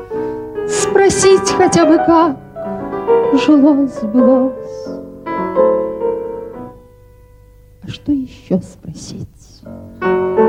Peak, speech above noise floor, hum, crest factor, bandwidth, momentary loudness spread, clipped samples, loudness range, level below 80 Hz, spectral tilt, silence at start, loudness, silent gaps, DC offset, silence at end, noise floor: 0 dBFS; 30 dB; none; 14 dB; 12 kHz; 21 LU; under 0.1%; 13 LU; -44 dBFS; -5 dB/octave; 0 s; -14 LUFS; none; under 0.1%; 0 s; -43 dBFS